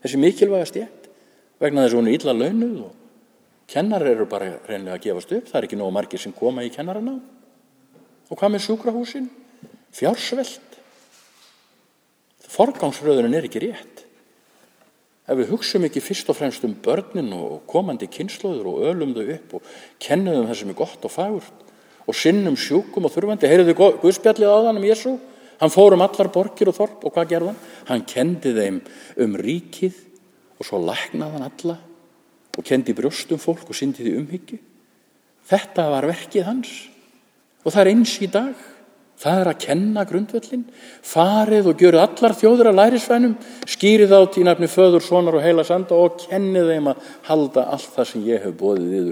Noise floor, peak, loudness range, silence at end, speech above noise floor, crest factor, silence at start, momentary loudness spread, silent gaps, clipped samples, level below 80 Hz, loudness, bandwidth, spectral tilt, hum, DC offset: -63 dBFS; 0 dBFS; 11 LU; 0 s; 44 dB; 20 dB; 0.05 s; 16 LU; none; under 0.1%; -74 dBFS; -19 LUFS; over 20 kHz; -5.5 dB/octave; none; under 0.1%